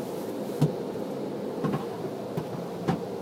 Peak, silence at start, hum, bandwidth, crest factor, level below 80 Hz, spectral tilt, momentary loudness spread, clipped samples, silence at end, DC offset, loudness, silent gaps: -10 dBFS; 0 s; none; 16 kHz; 20 dB; -62 dBFS; -7.5 dB/octave; 6 LU; under 0.1%; 0 s; under 0.1%; -32 LUFS; none